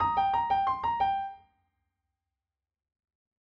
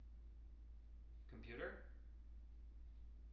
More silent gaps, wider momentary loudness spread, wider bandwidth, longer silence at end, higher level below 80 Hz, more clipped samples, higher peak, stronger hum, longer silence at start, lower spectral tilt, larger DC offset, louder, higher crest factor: neither; second, 7 LU vs 11 LU; about the same, 6 kHz vs 6 kHz; first, 2.2 s vs 0 s; about the same, -58 dBFS vs -58 dBFS; neither; first, -16 dBFS vs -36 dBFS; neither; about the same, 0 s vs 0 s; about the same, -5.5 dB/octave vs -5.5 dB/octave; neither; first, -28 LUFS vs -58 LUFS; about the same, 16 dB vs 20 dB